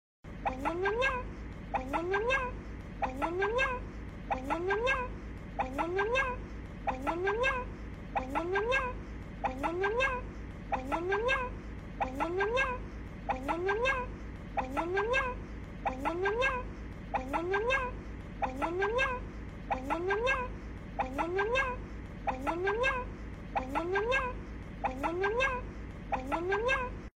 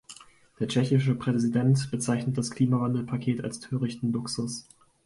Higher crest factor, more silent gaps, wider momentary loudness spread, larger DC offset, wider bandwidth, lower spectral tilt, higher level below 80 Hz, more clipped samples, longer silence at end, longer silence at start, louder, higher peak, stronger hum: about the same, 16 dB vs 16 dB; neither; first, 14 LU vs 10 LU; neither; first, 15.5 kHz vs 11.5 kHz; about the same, -5.5 dB/octave vs -6.5 dB/octave; first, -46 dBFS vs -62 dBFS; neither; second, 0.1 s vs 0.45 s; first, 0.25 s vs 0.1 s; second, -33 LUFS vs -27 LUFS; second, -18 dBFS vs -12 dBFS; neither